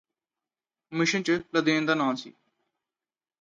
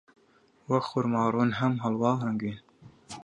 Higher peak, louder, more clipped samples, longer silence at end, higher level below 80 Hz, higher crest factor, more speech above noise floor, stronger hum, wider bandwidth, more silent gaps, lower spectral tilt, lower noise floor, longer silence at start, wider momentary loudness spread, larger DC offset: about the same, -10 dBFS vs -10 dBFS; about the same, -26 LUFS vs -28 LUFS; neither; first, 1.1 s vs 0 s; second, -72 dBFS vs -66 dBFS; about the same, 20 dB vs 18 dB; first, over 64 dB vs 36 dB; neither; second, 7.6 kHz vs 10 kHz; neither; second, -4.5 dB/octave vs -7.5 dB/octave; first, under -90 dBFS vs -63 dBFS; first, 0.9 s vs 0.7 s; about the same, 9 LU vs 10 LU; neither